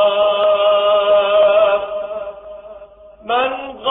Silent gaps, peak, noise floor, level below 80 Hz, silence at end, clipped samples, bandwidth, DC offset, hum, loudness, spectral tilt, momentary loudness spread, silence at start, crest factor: none; -4 dBFS; -40 dBFS; -54 dBFS; 0 s; under 0.1%; 3.9 kHz; under 0.1%; none; -15 LUFS; -5.5 dB/octave; 22 LU; 0 s; 12 dB